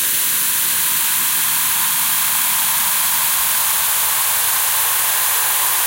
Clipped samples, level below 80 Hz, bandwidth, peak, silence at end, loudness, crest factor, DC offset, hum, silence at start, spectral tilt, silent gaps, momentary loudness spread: under 0.1%; -54 dBFS; 16.5 kHz; -4 dBFS; 0 s; -14 LUFS; 14 dB; under 0.1%; none; 0 s; 2 dB/octave; none; 0 LU